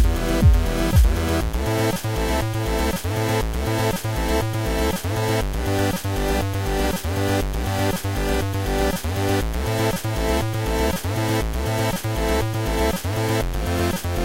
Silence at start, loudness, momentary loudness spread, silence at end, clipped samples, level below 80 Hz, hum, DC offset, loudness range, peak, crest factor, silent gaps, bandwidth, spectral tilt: 0 s; -22 LUFS; 4 LU; 0 s; under 0.1%; -26 dBFS; none; under 0.1%; 1 LU; -6 dBFS; 16 dB; none; 16 kHz; -5.5 dB/octave